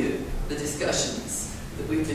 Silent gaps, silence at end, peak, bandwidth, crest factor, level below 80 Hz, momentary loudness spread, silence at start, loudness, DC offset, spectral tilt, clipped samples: none; 0 s; -12 dBFS; 16 kHz; 16 dB; -38 dBFS; 8 LU; 0 s; -29 LUFS; under 0.1%; -3.5 dB/octave; under 0.1%